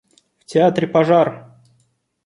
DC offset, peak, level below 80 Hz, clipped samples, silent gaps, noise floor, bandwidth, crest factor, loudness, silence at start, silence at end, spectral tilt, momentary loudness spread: under 0.1%; -2 dBFS; -62 dBFS; under 0.1%; none; -64 dBFS; 11 kHz; 16 dB; -16 LUFS; 0.5 s; 0.85 s; -7 dB/octave; 7 LU